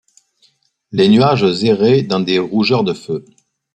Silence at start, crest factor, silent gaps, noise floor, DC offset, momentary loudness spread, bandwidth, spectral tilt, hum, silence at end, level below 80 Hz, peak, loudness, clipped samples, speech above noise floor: 0.9 s; 14 dB; none; -58 dBFS; under 0.1%; 13 LU; 9 kHz; -7 dB/octave; none; 0.55 s; -56 dBFS; -2 dBFS; -14 LUFS; under 0.1%; 44 dB